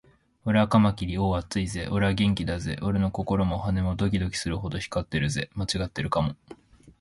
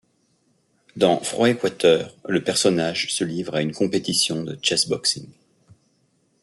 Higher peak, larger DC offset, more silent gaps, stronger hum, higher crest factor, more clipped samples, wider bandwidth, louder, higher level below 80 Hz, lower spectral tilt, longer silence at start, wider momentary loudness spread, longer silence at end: second, -8 dBFS vs -4 dBFS; neither; neither; neither; about the same, 18 dB vs 20 dB; neither; about the same, 11.5 kHz vs 12 kHz; second, -27 LUFS vs -21 LUFS; first, -40 dBFS vs -64 dBFS; first, -6 dB/octave vs -3.5 dB/octave; second, 0.45 s vs 0.95 s; about the same, 8 LU vs 6 LU; second, 0.1 s vs 1.1 s